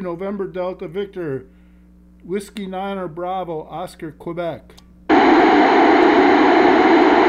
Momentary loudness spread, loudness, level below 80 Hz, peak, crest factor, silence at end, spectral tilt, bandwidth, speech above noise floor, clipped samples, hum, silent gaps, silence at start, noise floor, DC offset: 18 LU; -16 LUFS; -48 dBFS; -4 dBFS; 14 dB; 0 s; -6 dB/octave; 11 kHz; 21 dB; under 0.1%; none; none; 0 s; -47 dBFS; under 0.1%